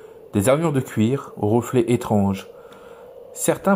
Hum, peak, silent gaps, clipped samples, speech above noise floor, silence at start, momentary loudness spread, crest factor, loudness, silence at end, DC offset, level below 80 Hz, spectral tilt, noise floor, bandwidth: none; -4 dBFS; none; under 0.1%; 23 dB; 0.05 s; 13 LU; 16 dB; -21 LUFS; 0 s; under 0.1%; -58 dBFS; -6.5 dB/octave; -42 dBFS; 16 kHz